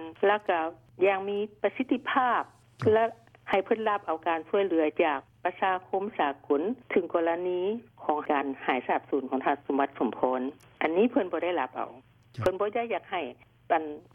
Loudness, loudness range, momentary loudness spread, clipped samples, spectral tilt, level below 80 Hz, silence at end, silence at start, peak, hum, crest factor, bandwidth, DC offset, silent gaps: -29 LUFS; 2 LU; 7 LU; under 0.1%; -7 dB/octave; -68 dBFS; 0.15 s; 0 s; -10 dBFS; none; 18 dB; 8 kHz; under 0.1%; none